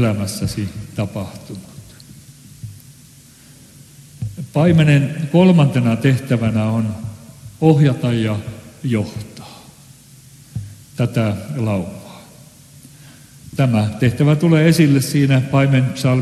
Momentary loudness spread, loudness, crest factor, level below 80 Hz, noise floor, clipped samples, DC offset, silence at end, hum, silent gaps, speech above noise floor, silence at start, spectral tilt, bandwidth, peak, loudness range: 21 LU; -16 LUFS; 18 dB; -48 dBFS; -44 dBFS; under 0.1%; under 0.1%; 0 s; none; none; 29 dB; 0 s; -7 dB/octave; 13 kHz; 0 dBFS; 13 LU